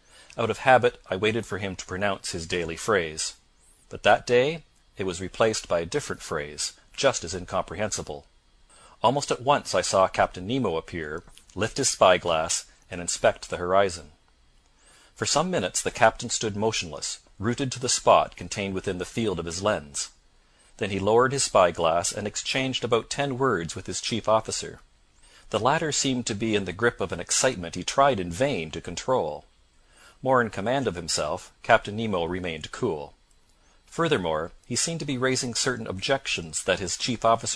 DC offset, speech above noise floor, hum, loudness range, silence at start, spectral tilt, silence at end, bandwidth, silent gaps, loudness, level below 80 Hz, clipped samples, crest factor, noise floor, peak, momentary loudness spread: under 0.1%; 35 dB; none; 3 LU; 0.35 s; -3.5 dB/octave; 0 s; 14 kHz; none; -25 LUFS; -52 dBFS; under 0.1%; 24 dB; -60 dBFS; -2 dBFS; 11 LU